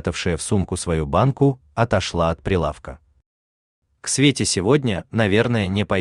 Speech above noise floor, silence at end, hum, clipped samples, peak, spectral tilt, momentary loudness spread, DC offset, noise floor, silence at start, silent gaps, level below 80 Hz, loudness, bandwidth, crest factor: over 70 dB; 0 s; none; under 0.1%; -2 dBFS; -5 dB/octave; 6 LU; under 0.1%; under -90 dBFS; 0.05 s; 3.26-3.82 s; -42 dBFS; -20 LUFS; 12.5 kHz; 18 dB